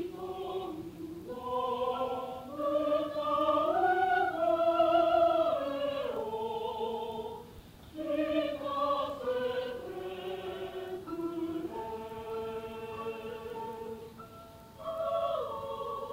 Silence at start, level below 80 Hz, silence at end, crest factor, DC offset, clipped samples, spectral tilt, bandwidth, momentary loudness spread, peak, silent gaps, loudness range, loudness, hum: 0 s; -62 dBFS; 0 s; 18 dB; under 0.1%; under 0.1%; -5.5 dB/octave; 16 kHz; 15 LU; -16 dBFS; none; 11 LU; -33 LUFS; none